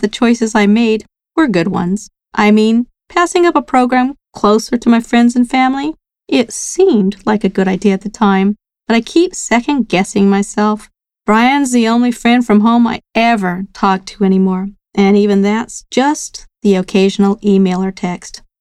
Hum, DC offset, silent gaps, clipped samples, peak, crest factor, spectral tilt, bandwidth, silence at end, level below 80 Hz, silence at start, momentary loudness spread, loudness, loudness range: none; under 0.1%; none; under 0.1%; 0 dBFS; 12 dB; -5.5 dB/octave; 12.5 kHz; 0.25 s; -46 dBFS; 0 s; 9 LU; -13 LUFS; 2 LU